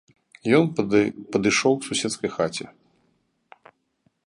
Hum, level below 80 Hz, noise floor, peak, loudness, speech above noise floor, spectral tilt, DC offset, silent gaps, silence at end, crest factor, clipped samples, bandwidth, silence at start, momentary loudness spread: none; -62 dBFS; -69 dBFS; -6 dBFS; -22 LUFS; 47 dB; -4.5 dB/octave; under 0.1%; none; 1.55 s; 20 dB; under 0.1%; 11.5 kHz; 0.45 s; 10 LU